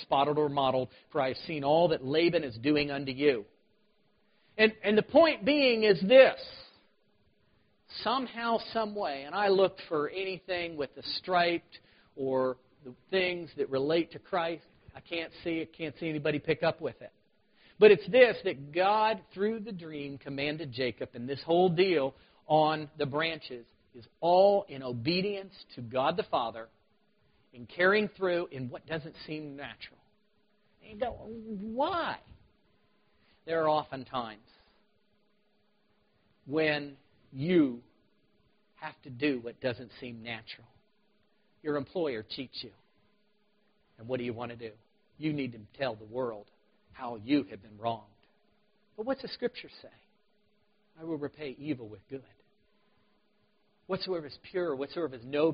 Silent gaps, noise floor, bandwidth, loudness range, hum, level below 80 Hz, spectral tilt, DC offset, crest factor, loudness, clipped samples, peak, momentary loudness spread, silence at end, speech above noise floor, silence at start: none; -73 dBFS; 5.2 kHz; 13 LU; none; -68 dBFS; -3.5 dB/octave; under 0.1%; 24 dB; -30 LUFS; under 0.1%; -6 dBFS; 19 LU; 0 s; 43 dB; 0 s